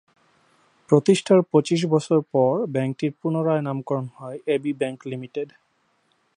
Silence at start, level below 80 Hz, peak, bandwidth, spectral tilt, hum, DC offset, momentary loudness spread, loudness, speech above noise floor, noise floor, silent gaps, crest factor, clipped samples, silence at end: 0.9 s; -72 dBFS; -2 dBFS; 11 kHz; -6.5 dB/octave; none; under 0.1%; 14 LU; -22 LUFS; 45 dB; -67 dBFS; none; 20 dB; under 0.1%; 0.9 s